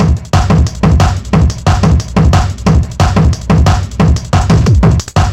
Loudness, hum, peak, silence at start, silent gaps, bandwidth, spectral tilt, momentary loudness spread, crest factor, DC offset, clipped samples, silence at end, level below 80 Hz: -10 LUFS; none; 0 dBFS; 0 s; none; 11.5 kHz; -6.5 dB/octave; 3 LU; 8 dB; 0.3%; under 0.1%; 0 s; -16 dBFS